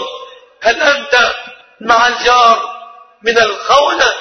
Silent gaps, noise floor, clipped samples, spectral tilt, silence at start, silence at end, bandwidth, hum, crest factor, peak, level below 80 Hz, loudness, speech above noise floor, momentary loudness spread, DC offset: none; -34 dBFS; under 0.1%; -1 dB/octave; 0 s; 0 s; 11 kHz; none; 12 dB; 0 dBFS; -46 dBFS; -11 LUFS; 24 dB; 16 LU; under 0.1%